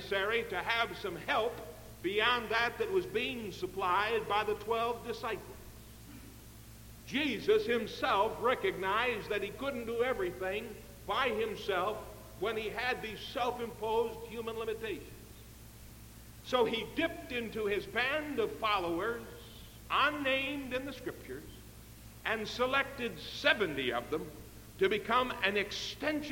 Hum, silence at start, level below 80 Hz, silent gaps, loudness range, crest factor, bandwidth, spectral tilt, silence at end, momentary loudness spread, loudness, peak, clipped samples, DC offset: 60 Hz at -55 dBFS; 0 s; -56 dBFS; none; 5 LU; 22 dB; 17 kHz; -4 dB/octave; 0 s; 21 LU; -34 LUFS; -12 dBFS; under 0.1%; under 0.1%